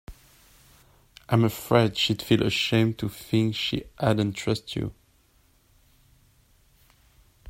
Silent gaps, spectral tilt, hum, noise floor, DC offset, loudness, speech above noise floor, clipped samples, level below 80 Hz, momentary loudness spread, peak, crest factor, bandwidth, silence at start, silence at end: none; -6 dB/octave; none; -62 dBFS; under 0.1%; -25 LUFS; 38 dB; under 0.1%; -52 dBFS; 8 LU; -4 dBFS; 22 dB; 16 kHz; 0.1 s; 0 s